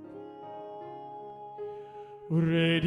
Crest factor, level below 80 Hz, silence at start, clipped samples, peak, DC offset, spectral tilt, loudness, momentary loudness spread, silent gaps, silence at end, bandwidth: 16 dB; -68 dBFS; 0 s; under 0.1%; -16 dBFS; under 0.1%; -8 dB/octave; -32 LUFS; 19 LU; none; 0 s; 9.6 kHz